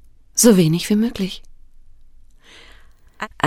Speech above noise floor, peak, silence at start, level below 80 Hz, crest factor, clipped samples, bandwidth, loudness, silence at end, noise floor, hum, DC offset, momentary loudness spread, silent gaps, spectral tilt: 30 dB; -2 dBFS; 0.35 s; -44 dBFS; 20 dB; under 0.1%; 16.5 kHz; -17 LUFS; 0 s; -45 dBFS; none; under 0.1%; 20 LU; none; -4.5 dB/octave